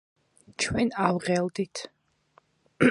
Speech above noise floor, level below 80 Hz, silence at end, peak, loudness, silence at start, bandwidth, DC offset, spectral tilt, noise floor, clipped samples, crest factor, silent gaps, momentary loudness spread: 37 dB; -54 dBFS; 0 s; -6 dBFS; -27 LUFS; 0.6 s; 11.5 kHz; under 0.1%; -5 dB/octave; -64 dBFS; under 0.1%; 22 dB; none; 16 LU